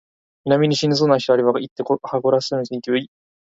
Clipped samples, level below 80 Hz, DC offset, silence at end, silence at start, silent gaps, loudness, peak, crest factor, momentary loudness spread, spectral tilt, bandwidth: under 0.1%; -62 dBFS; under 0.1%; 0.45 s; 0.45 s; 1.71-1.76 s; -19 LUFS; -2 dBFS; 18 dB; 8 LU; -6 dB/octave; 7.8 kHz